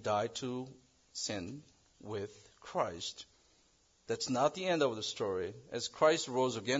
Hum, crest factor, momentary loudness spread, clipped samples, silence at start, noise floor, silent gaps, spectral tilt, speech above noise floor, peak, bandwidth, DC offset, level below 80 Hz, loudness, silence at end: none; 20 dB; 18 LU; under 0.1%; 0 s; -70 dBFS; none; -3 dB/octave; 35 dB; -16 dBFS; 7.6 kHz; under 0.1%; -74 dBFS; -35 LUFS; 0 s